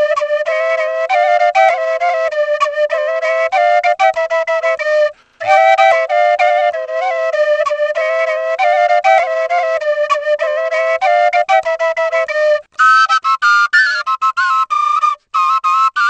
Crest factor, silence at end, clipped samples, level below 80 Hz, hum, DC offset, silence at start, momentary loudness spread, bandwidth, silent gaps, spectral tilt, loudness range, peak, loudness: 14 dB; 0 s; under 0.1%; -66 dBFS; none; under 0.1%; 0 s; 6 LU; 8.6 kHz; none; 1 dB/octave; 2 LU; 0 dBFS; -13 LUFS